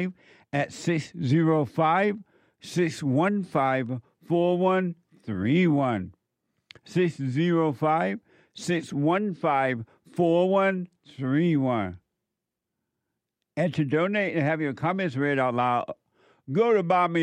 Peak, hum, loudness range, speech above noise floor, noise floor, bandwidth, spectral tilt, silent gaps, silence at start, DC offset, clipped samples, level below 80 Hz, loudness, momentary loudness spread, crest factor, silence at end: -10 dBFS; none; 3 LU; 60 dB; -85 dBFS; 11 kHz; -7 dB/octave; none; 0 s; under 0.1%; under 0.1%; -70 dBFS; -25 LUFS; 12 LU; 16 dB; 0 s